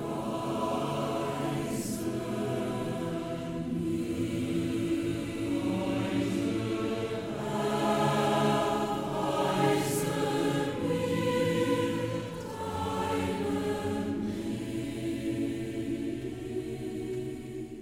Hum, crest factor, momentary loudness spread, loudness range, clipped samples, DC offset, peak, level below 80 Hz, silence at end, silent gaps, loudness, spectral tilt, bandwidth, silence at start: none; 18 dB; 8 LU; 5 LU; under 0.1%; under 0.1%; -12 dBFS; -54 dBFS; 0 s; none; -31 LUFS; -6 dB/octave; 17 kHz; 0 s